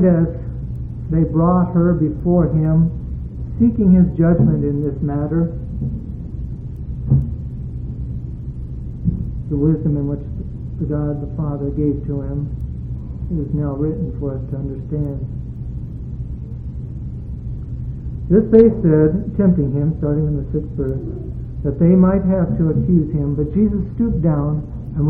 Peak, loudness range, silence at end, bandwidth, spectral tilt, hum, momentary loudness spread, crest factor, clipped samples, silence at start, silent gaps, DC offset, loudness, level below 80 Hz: 0 dBFS; 9 LU; 0 s; 2.6 kHz; -13.5 dB/octave; none; 15 LU; 18 dB; under 0.1%; 0 s; none; under 0.1%; -19 LUFS; -30 dBFS